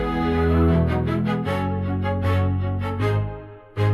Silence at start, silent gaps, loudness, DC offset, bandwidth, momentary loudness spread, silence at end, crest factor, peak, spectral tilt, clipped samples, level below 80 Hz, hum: 0 s; none; -22 LUFS; under 0.1%; 12 kHz; 7 LU; 0 s; 12 dB; -10 dBFS; -9 dB/octave; under 0.1%; -36 dBFS; none